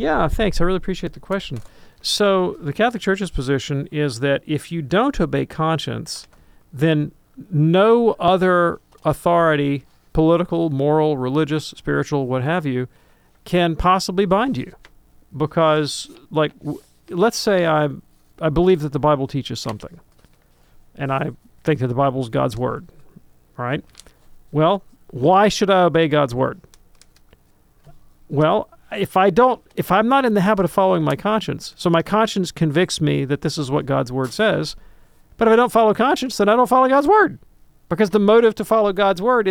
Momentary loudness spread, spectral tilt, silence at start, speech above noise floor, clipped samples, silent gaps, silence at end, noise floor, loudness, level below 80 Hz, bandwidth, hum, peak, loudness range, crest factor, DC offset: 12 LU; -6 dB/octave; 0 s; 37 dB; under 0.1%; none; 0 s; -55 dBFS; -19 LUFS; -40 dBFS; 17 kHz; none; -2 dBFS; 6 LU; 16 dB; under 0.1%